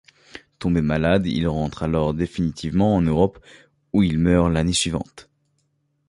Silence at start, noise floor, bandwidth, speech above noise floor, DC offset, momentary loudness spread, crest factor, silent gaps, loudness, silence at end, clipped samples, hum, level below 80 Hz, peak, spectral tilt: 0.35 s; -69 dBFS; 11.5 kHz; 49 dB; under 0.1%; 7 LU; 18 dB; none; -21 LUFS; 0.85 s; under 0.1%; none; -36 dBFS; -4 dBFS; -6 dB/octave